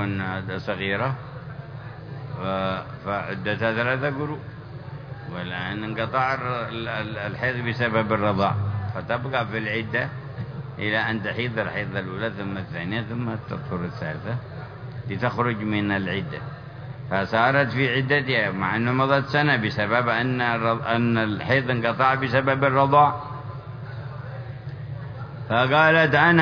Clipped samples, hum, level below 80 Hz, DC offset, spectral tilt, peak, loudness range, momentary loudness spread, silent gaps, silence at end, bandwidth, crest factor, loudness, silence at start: under 0.1%; none; -54 dBFS; under 0.1%; -8 dB/octave; -2 dBFS; 7 LU; 16 LU; none; 0 s; 5.4 kHz; 22 dB; -23 LUFS; 0 s